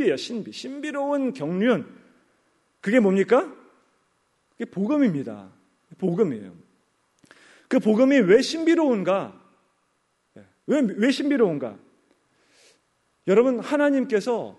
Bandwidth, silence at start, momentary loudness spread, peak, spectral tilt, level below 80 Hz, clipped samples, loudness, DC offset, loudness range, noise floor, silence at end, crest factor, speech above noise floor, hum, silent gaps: 11.5 kHz; 0 s; 16 LU; -6 dBFS; -6 dB/octave; -72 dBFS; under 0.1%; -22 LUFS; under 0.1%; 6 LU; -70 dBFS; 0.05 s; 18 dB; 49 dB; none; none